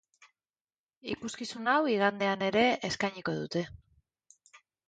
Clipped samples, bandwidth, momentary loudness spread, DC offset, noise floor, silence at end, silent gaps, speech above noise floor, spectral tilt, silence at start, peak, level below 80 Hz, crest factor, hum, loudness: under 0.1%; 9.4 kHz; 12 LU; under 0.1%; under -90 dBFS; 0.3 s; none; over 60 dB; -4.5 dB/octave; 1.05 s; -12 dBFS; -66 dBFS; 20 dB; none; -30 LUFS